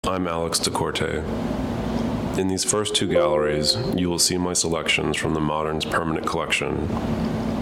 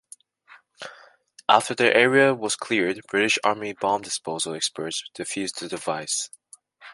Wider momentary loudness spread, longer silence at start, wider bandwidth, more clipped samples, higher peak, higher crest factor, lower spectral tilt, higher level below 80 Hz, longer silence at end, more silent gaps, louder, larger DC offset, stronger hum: second, 6 LU vs 13 LU; second, 0.05 s vs 0.8 s; first, 17 kHz vs 11.5 kHz; neither; second, -6 dBFS vs -2 dBFS; second, 18 dB vs 24 dB; about the same, -3.5 dB/octave vs -2.5 dB/octave; first, -40 dBFS vs -70 dBFS; about the same, 0 s vs 0 s; neither; about the same, -22 LUFS vs -23 LUFS; neither; neither